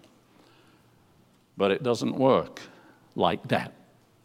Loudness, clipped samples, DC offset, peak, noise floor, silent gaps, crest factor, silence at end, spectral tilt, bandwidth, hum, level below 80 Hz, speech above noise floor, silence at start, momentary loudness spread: -26 LUFS; under 0.1%; under 0.1%; -8 dBFS; -61 dBFS; none; 22 dB; 0.55 s; -6 dB/octave; 14.5 kHz; none; -66 dBFS; 36 dB; 1.55 s; 18 LU